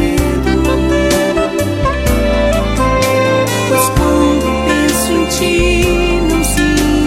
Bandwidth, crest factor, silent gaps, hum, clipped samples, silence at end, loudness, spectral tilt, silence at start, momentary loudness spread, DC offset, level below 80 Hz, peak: 16.5 kHz; 12 dB; none; none; under 0.1%; 0 s; -13 LUFS; -5 dB/octave; 0 s; 2 LU; under 0.1%; -20 dBFS; 0 dBFS